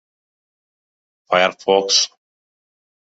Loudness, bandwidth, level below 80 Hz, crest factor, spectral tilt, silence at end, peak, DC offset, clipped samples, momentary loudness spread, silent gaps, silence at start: -16 LUFS; 8 kHz; -70 dBFS; 20 dB; -1 dB/octave; 1.05 s; -2 dBFS; under 0.1%; under 0.1%; 6 LU; none; 1.3 s